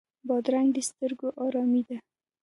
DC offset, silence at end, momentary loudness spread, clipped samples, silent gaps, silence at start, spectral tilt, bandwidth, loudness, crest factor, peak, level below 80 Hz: under 0.1%; 0.4 s; 7 LU; under 0.1%; none; 0.25 s; -4 dB/octave; 11.5 kHz; -28 LUFS; 16 dB; -14 dBFS; -80 dBFS